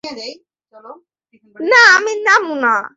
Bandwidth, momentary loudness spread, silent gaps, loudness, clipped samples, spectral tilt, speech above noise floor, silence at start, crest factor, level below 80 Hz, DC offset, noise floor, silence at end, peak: 8 kHz; 21 LU; none; -11 LUFS; under 0.1%; -0.5 dB/octave; 43 dB; 0.05 s; 16 dB; -66 dBFS; under 0.1%; -56 dBFS; 0.1 s; 0 dBFS